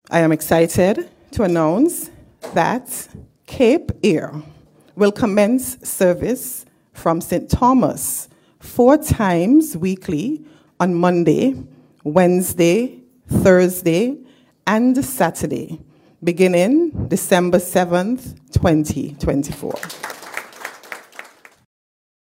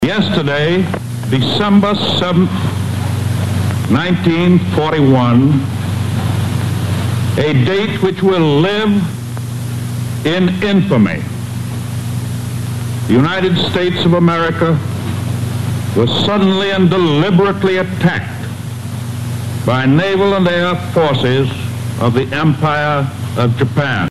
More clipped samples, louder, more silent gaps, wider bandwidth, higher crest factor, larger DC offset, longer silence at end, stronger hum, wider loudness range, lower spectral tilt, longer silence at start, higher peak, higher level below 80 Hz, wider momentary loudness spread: neither; second, -17 LUFS vs -14 LUFS; neither; first, 16.5 kHz vs 13.5 kHz; about the same, 18 dB vs 14 dB; second, under 0.1% vs 1%; first, 1.1 s vs 0 s; neither; about the same, 4 LU vs 3 LU; about the same, -6 dB/octave vs -6.5 dB/octave; about the same, 0.1 s vs 0 s; about the same, 0 dBFS vs 0 dBFS; about the same, -40 dBFS vs -44 dBFS; first, 17 LU vs 10 LU